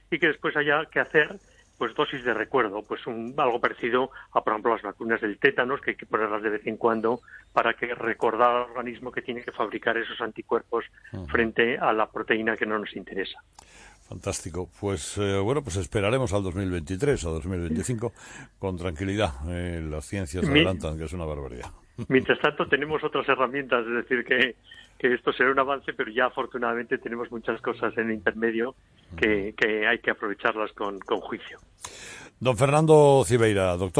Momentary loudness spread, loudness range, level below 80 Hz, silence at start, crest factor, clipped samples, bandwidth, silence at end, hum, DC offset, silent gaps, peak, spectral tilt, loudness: 12 LU; 4 LU; -48 dBFS; 0.1 s; 20 dB; under 0.1%; 11 kHz; 0 s; none; under 0.1%; none; -6 dBFS; -5 dB/octave; -26 LUFS